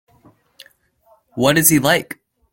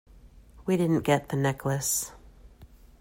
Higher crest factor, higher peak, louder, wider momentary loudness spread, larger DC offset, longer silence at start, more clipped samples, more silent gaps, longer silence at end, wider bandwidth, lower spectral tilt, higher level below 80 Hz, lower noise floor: about the same, 20 dB vs 20 dB; first, 0 dBFS vs -10 dBFS; first, -15 LUFS vs -27 LUFS; first, 22 LU vs 8 LU; neither; first, 1.35 s vs 0.25 s; neither; neither; about the same, 0.4 s vs 0.35 s; about the same, 16.5 kHz vs 16 kHz; second, -3.5 dB/octave vs -5 dB/octave; about the same, -52 dBFS vs -54 dBFS; first, -57 dBFS vs -52 dBFS